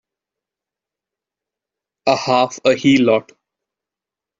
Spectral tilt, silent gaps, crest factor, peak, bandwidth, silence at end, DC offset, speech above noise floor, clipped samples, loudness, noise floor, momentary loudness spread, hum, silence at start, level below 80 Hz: -5 dB/octave; none; 18 dB; -2 dBFS; 7.8 kHz; 1.2 s; under 0.1%; 72 dB; under 0.1%; -16 LUFS; -87 dBFS; 6 LU; none; 2.05 s; -62 dBFS